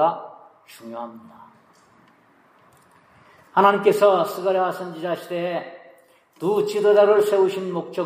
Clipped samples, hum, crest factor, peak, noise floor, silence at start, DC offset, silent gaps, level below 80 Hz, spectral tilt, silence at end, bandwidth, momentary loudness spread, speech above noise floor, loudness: under 0.1%; none; 18 dB; -4 dBFS; -56 dBFS; 0 s; under 0.1%; none; -80 dBFS; -5.5 dB/octave; 0 s; 15.5 kHz; 19 LU; 36 dB; -20 LUFS